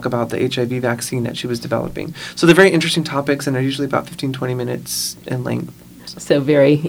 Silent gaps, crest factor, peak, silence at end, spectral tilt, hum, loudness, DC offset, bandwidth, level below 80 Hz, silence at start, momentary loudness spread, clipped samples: none; 18 dB; 0 dBFS; 0 s; -5 dB/octave; none; -18 LUFS; under 0.1%; over 20 kHz; -50 dBFS; 0 s; 14 LU; under 0.1%